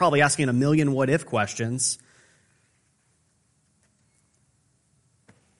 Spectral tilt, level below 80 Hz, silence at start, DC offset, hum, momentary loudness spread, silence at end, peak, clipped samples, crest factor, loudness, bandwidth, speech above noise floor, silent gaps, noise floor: -4.5 dB/octave; -64 dBFS; 0 s; under 0.1%; none; 7 LU; 3.65 s; -6 dBFS; under 0.1%; 20 dB; -23 LUFS; 11.5 kHz; 45 dB; none; -67 dBFS